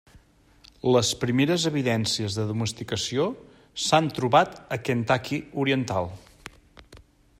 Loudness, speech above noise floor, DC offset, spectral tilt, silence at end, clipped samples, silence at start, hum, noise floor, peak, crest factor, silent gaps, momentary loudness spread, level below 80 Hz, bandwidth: -25 LUFS; 32 dB; under 0.1%; -4.5 dB/octave; 0.4 s; under 0.1%; 0.85 s; none; -57 dBFS; -6 dBFS; 20 dB; none; 15 LU; -58 dBFS; 16 kHz